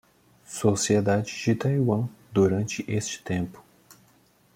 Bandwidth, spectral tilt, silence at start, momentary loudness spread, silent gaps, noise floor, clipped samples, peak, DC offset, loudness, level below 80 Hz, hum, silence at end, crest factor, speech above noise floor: 16.5 kHz; -5.5 dB/octave; 0.5 s; 8 LU; none; -61 dBFS; under 0.1%; -8 dBFS; under 0.1%; -26 LUFS; -60 dBFS; none; 0.95 s; 18 dB; 37 dB